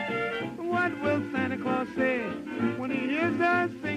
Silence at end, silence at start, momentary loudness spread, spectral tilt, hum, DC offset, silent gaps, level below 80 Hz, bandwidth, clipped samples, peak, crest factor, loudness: 0 s; 0 s; 6 LU; -6.5 dB/octave; none; under 0.1%; none; -66 dBFS; 12 kHz; under 0.1%; -12 dBFS; 16 dB; -28 LUFS